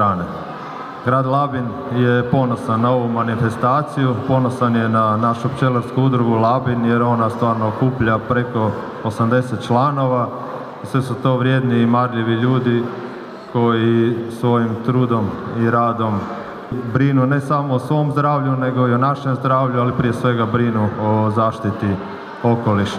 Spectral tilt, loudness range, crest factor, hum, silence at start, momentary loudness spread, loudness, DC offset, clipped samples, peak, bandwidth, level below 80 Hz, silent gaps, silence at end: -8.5 dB/octave; 2 LU; 14 dB; none; 0 s; 8 LU; -18 LUFS; under 0.1%; under 0.1%; -2 dBFS; 11 kHz; -50 dBFS; none; 0 s